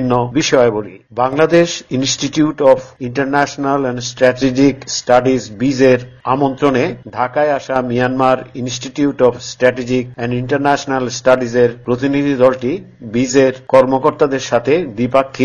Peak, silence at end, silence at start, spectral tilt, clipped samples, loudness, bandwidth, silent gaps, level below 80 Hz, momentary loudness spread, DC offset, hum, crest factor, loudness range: 0 dBFS; 0 s; 0 s; -5 dB/octave; under 0.1%; -15 LUFS; 8.4 kHz; none; -46 dBFS; 8 LU; under 0.1%; none; 14 dB; 2 LU